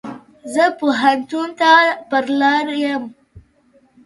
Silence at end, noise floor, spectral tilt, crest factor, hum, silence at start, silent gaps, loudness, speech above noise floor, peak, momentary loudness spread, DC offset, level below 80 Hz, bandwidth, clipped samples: 0.65 s; -55 dBFS; -3.5 dB/octave; 18 dB; none; 0.05 s; none; -16 LUFS; 39 dB; 0 dBFS; 14 LU; under 0.1%; -60 dBFS; 11.5 kHz; under 0.1%